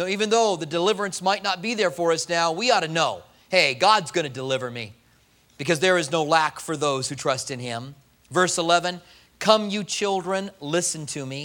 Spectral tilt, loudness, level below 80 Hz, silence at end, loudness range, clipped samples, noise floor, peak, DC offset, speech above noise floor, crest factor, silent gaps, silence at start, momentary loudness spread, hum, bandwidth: -3 dB/octave; -23 LUFS; -66 dBFS; 0 s; 3 LU; under 0.1%; -59 dBFS; -2 dBFS; under 0.1%; 36 dB; 22 dB; none; 0 s; 11 LU; none; 17 kHz